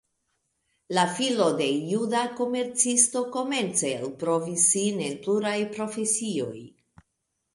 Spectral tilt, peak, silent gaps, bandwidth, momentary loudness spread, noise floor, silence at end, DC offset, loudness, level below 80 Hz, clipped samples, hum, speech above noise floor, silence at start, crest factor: -3 dB/octave; -6 dBFS; none; 11.5 kHz; 10 LU; -79 dBFS; 0.85 s; under 0.1%; -25 LUFS; -72 dBFS; under 0.1%; none; 53 dB; 0.9 s; 20 dB